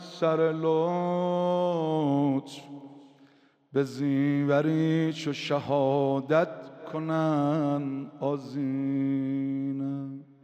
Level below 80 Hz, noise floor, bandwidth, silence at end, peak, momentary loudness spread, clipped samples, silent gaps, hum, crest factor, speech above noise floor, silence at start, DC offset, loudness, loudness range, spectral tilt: -76 dBFS; -60 dBFS; 9 kHz; 0.2 s; -12 dBFS; 9 LU; under 0.1%; none; none; 16 dB; 33 dB; 0 s; under 0.1%; -28 LUFS; 3 LU; -7.5 dB/octave